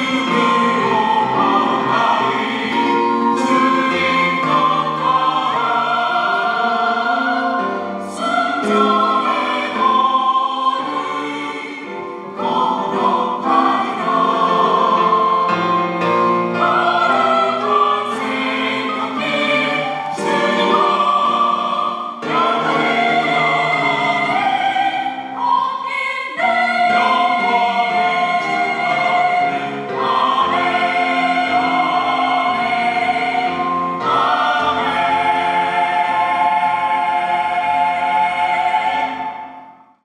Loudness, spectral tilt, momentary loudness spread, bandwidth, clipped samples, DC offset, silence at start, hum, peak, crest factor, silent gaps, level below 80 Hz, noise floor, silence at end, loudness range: -16 LUFS; -4.5 dB/octave; 6 LU; 11.5 kHz; under 0.1%; under 0.1%; 0 s; none; -2 dBFS; 14 dB; none; -64 dBFS; -40 dBFS; 0.35 s; 2 LU